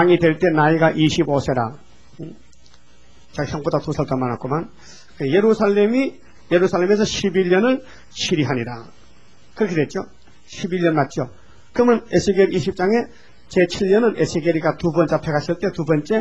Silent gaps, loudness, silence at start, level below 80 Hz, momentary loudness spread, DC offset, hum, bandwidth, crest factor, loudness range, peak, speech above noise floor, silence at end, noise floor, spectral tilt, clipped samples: none; -19 LUFS; 0 s; -48 dBFS; 14 LU; 0.8%; none; 8.2 kHz; 16 dB; 6 LU; -2 dBFS; 34 dB; 0 s; -52 dBFS; -6 dB/octave; under 0.1%